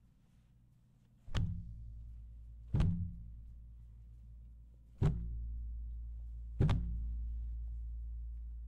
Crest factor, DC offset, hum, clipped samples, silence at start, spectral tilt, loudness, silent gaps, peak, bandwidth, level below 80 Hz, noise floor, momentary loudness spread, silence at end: 20 dB; under 0.1%; none; under 0.1%; 1.25 s; -8 dB/octave; -41 LUFS; none; -20 dBFS; 8 kHz; -44 dBFS; -66 dBFS; 22 LU; 0 s